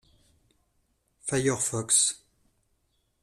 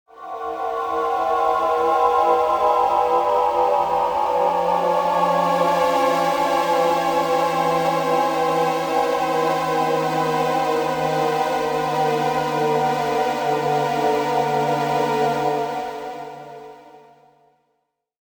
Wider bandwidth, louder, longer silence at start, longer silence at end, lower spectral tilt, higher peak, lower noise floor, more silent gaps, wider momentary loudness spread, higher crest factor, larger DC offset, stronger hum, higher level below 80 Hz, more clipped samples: second, 14.5 kHz vs 19 kHz; second, -25 LUFS vs -20 LUFS; first, 1.25 s vs 0.15 s; second, 1.05 s vs 1.35 s; second, -2.5 dB/octave vs -5 dB/octave; second, -10 dBFS vs -4 dBFS; about the same, -73 dBFS vs -73 dBFS; neither; first, 15 LU vs 6 LU; first, 22 dB vs 16 dB; neither; neither; second, -64 dBFS vs -56 dBFS; neither